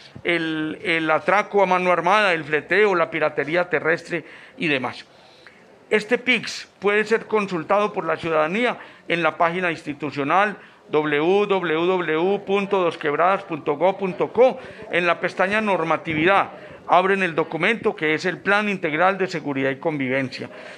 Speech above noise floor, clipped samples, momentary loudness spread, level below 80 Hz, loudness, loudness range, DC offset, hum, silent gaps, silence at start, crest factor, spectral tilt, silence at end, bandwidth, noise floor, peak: 28 dB; under 0.1%; 7 LU; -64 dBFS; -21 LUFS; 3 LU; under 0.1%; none; none; 0 s; 20 dB; -5.5 dB/octave; 0 s; 11 kHz; -49 dBFS; -2 dBFS